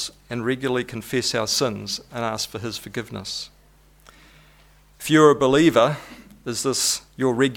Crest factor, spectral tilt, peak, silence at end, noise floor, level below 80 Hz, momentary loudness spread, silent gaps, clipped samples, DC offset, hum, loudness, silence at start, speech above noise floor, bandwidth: 20 dB; -4 dB/octave; -2 dBFS; 0 s; -54 dBFS; -54 dBFS; 15 LU; none; under 0.1%; under 0.1%; none; -22 LUFS; 0 s; 32 dB; 18 kHz